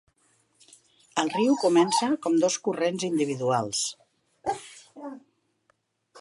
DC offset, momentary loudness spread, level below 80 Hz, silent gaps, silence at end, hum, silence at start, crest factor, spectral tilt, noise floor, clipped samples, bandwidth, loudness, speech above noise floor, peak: under 0.1%; 20 LU; -72 dBFS; none; 0 s; none; 1.15 s; 20 dB; -4 dB/octave; -71 dBFS; under 0.1%; 11.5 kHz; -26 LUFS; 47 dB; -8 dBFS